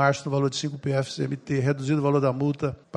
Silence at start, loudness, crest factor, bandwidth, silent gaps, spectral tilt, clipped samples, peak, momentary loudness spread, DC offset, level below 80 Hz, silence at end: 0 s; -26 LUFS; 18 dB; 10 kHz; none; -6.5 dB/octave; under 0.1%; -6 dBFS; 6 LU; under 0.1%; -60 dBFS; 0 s